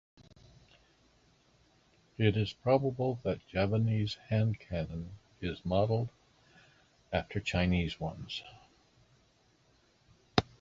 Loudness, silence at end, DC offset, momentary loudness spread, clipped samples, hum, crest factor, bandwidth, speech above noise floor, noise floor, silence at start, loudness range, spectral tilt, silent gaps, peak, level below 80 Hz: -33 LUFS; 0.15 s; under 0.1%; 12 LU; under 0.1%; none; 28 dB; 7.6 kHz; 36 dB; -68 dBFS; 2.2 s; 5 LU; -7 dB/octave; none; -6 dBFS; -52 dBFS